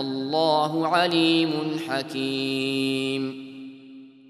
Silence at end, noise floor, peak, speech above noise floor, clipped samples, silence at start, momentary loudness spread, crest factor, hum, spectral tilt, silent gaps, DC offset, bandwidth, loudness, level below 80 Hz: 0.2 s; -46 dBFS; -6 dBFS; 22 dB; under 0.1%; 0 s; 15 LU; 18 dB; none; -5 dB/octave; none; under 0.1%; 13 kHz; -24 LUFS; -74 dBFS